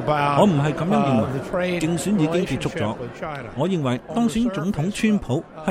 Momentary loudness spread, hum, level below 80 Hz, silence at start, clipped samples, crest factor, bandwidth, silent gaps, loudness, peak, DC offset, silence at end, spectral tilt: 9 LU; none; -46 dBFS; 0 s; under 0.1%; 18 dB; 14 kHz; none; -22 LUFS; -4 dBFS; under 0.1%; 0 s; -6.5 dB/octave